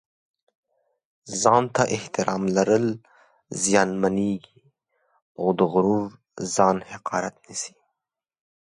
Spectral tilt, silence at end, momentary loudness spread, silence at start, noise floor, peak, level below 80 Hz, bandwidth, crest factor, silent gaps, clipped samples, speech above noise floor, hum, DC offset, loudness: -4.5 dB/octave; 1.05 s; 13 LU; 1.25 s; -85 dBFS; -4 dBFS; -62 dBFS; 11.5 kHz; 22 dB; 5.22-5.35 s; under 0.1%; 63 dB; none; under 0.1%; -23 LUFS